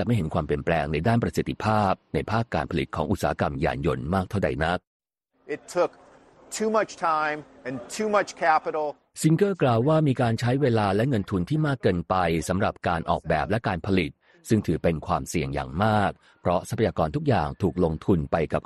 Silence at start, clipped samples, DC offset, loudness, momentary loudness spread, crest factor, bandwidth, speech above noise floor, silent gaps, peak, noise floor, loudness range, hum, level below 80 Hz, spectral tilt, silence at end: 0 s; under 0.1%; under 0.1%; -25 LUFS; 7 LU; 18 dB; 13 kHz; 29 dB; 4.87-5.00 s; -8 dBFS; -54 dBFS; 5 LU; none; -44 dBFS; -6.5 dB/octave; 0.05 s